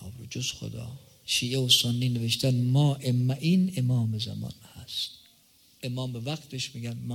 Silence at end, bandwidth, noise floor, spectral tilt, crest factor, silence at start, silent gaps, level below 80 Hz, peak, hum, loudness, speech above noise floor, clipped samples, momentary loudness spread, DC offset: 0 s; 16.5 kHz; -60 dBFS; -4.5 dB/octave; 20 dB; 0 s; none; -62 dBFS; -8 dBFS; none; -27 LUFS; 33 dB; under 0.1%; 17 LU; under 0.1%